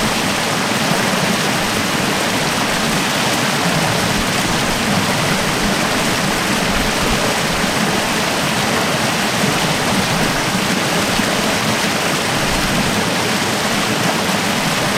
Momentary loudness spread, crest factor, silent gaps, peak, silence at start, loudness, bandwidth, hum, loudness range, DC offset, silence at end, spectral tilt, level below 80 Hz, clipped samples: 1 LU; 14 dB; none; -2 dBFS; 0 s; -16 LUFS; 16 kHz; none; 0 LU; under 0.1%; 0 s; -3 dB/octave; -36 dBFS; under 0.1%